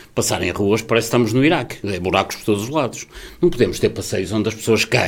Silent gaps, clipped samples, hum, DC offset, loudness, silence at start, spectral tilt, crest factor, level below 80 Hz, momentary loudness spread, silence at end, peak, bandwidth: none; under 0.1%; none; under 0.1%; -19 LUFS; 0 s; -4.5 dB/octave; 18 dB; -44 dBFS; 7 LU; 0 s; 0 dBFS; 17 kHz